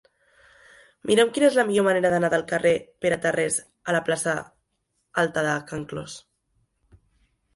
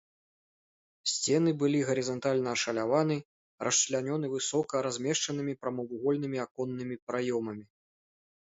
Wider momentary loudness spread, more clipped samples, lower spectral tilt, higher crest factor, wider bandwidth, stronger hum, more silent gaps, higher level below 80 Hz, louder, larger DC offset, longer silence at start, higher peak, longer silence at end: first, 14 LU vs 9 LU; neither; about the same, -4 dB/octave vs -4 dB/octave; about the same, 20 dB vs 18 dB; first, 11.5 kHz vs 8 kHz; neither; second, none vs 3.25-3.58 s, 6.51-6.55 s, 7.02-7.07 s; first, -62 dBFS vs -74 dBFS; first, -23 LUFS vs -31 LUFS; neither; about the same, 1.05 s vs 1.05 s; first, -4 dBFS vs -14 dBFS; first, 1.35 s vs 0.85 s